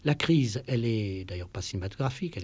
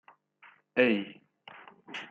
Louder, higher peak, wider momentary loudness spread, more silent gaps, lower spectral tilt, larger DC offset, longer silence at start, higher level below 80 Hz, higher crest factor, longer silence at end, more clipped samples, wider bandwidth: about the same, -30 LUFS vs -29 LUFS; about the same, -12 dBFS vs -10 dBFS; second, 11 LU vs 25 LU; neither; about the same, -6 dB/octave vs -6 dB/octave; neither; second, 0.05 s vs 0.75 s; first, -48 dBFS vs -82 dBFS; second, 18 dB vs 24 dB; about the same, 0 s vs 0.05 s; neither; about the same, 8 kHz vs 7.6 kHz